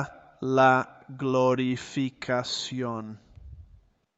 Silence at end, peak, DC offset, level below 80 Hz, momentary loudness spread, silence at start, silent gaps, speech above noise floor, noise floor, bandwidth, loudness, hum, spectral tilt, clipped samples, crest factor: 0.55 s; -8 dBFS; under 0.1%; -58 dBFS; 17 LU; 0 s; none; 32 dB; -58 dBFS; 8.2 kHz; -26 LUFS; none; -5.5 dB/octave; under 0.1%; 20 dB